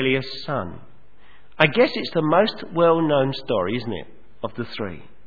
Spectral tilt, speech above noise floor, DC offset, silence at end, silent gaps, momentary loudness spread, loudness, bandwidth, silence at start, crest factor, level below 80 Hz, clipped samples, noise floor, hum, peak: -7.5 dB/octave; 33 dB; 1%; 0.25 s; none; 15 LU; -21 LUFS; 5.4 kHz; 0 s; 22 dB; -56 dBFS; under 0.1%; -55 dBFS; none; 0 dBFS